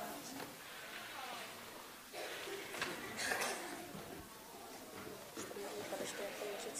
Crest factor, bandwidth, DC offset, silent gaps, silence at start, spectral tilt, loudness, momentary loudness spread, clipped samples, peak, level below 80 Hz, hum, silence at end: 24 dB; 15.5 kHz; under 0.1%; none; 0 s; -2 dB/octave; -45 LUFS; 11 LU; under 0.1%; -22 dBFS; -76 dBFS; none; 0 s